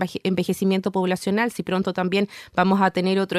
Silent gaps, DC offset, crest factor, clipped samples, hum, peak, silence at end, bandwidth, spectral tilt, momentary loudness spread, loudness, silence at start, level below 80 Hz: none; under 0.1%; 16 dB; under 0.1%; none; -6 dBFS; 0 s; 14 kHz; -6 dB/octave; 5 LU; -22 LUFS; 0 s; -60 dBFS